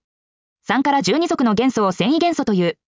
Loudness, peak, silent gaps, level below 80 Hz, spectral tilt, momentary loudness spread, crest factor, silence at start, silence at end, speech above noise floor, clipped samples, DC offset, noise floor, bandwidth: -18 LUFS; -6 dBFS; none; -58 dBFS; -5.5 dB/octave; 3 LU; 14 dB; 0.7 s; 0.15 s; over 73 dB; under 0.1%; under 0.1%; under -90 dBFS; 7.6 kHz